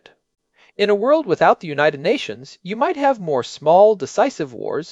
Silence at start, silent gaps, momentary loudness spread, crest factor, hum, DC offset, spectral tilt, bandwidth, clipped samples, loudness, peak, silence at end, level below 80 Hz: 0.8 s; none; 13 LU; 16 dB; none; under 0.1%; -5 dB/octave; 8 kHz; under 0.1%; -18 LUFS; -2 dBFS; 0 s; -66 dBFS